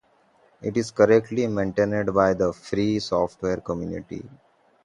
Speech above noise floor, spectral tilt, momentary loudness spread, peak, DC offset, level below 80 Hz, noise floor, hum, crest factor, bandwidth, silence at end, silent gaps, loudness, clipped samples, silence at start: 37 dB; -6.5 dB/octave; 14 LU; -4 dBFS; under 0.1%; -52 dBFS; -60 dBFS; none; 20 dB; 11 kHz; 0.55 s; none; -23 LUFS; under 0.1%; 0.6 s